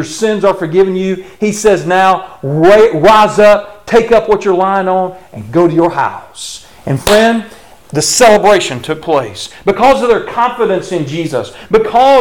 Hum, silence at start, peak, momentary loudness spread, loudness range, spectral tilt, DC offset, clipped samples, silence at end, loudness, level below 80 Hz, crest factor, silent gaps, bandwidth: none; 0 s; 0 dBFS; 12 LU; 4 LU; -4.5 dB/octave; under 0.1%; under 0.1%; 0 s; -10 LUFS; -38 dBFS; 10 dB; none; 18 kHz